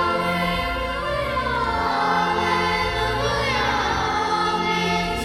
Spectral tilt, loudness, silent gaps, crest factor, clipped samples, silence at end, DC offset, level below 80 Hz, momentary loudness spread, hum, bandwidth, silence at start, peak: -4.5 dB/octave; -21 LUFS; none; 14 dB; under 0.1%; 0 s; under 0.1%; -36 dBFS; 3 LU; none; 16 kHz; 0 s; -8 dBFS